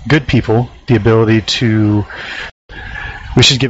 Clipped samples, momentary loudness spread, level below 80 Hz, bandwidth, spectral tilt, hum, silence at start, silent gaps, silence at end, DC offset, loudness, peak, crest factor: under 0.1%; 15 LU; -32 dBFS; 8 kHz; -4.5 dB/octave; none; 0 s; 2.51-2.69 s; 0 s; under 0.1%; -13 LUFS; 0 dBFS; 12 dB